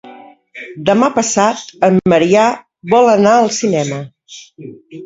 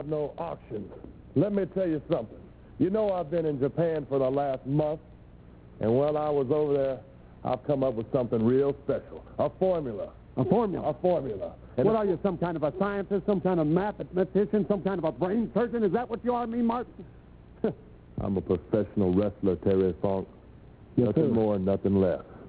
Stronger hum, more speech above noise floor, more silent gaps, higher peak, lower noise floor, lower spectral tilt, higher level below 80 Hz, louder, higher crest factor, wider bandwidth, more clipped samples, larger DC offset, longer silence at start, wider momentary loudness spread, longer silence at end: neither; about the same, 25 dB vs 23 dB; neither; first, 0 dBFS vs -10 dBFS; second, -38 dBFS vs -50 dBFS; second, -5 dB/octave vs -12 dB/octave; about the same, -54 dBFS vs -52 dBFS; first, -12 LUFS vs -28 LUFS; about the same, 14 dB vs 16 dB; first, 8 kHz vs 4 kHz; neither; neither; about the same, 0.05 s vs 0 s; first, 22 LU vs 11 LU; about the same, 0 s vs 0 s